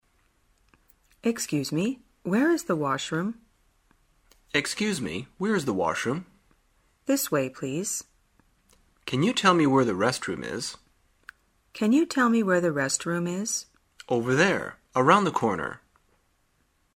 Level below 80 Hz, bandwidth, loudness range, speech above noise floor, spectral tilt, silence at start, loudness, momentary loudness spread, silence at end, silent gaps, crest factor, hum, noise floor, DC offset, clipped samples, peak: -64 dBFS; 16 kHz; 5 LU; 44 dB; -4.5 dB/octave; 1.25 s; -26 LUFS; 12 LU; 1.2 s; none; 24 dB; none; -69 dBFS; under 0.1%; under 0.1%; -4 dBFS